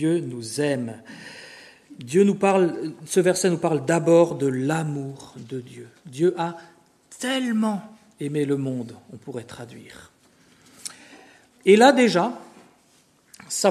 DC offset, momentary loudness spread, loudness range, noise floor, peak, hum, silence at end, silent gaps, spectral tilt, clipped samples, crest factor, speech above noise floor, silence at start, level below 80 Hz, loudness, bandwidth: under 0.1%; 22 LU; 9 LU; -60 dBFS; 0 dBFS; none; 0 s; none; -5 dB/octave; under 0.1%; 22 dB; 38 dB; 0 s; -70 dBFS; -22 LUFS; 13.5 kHz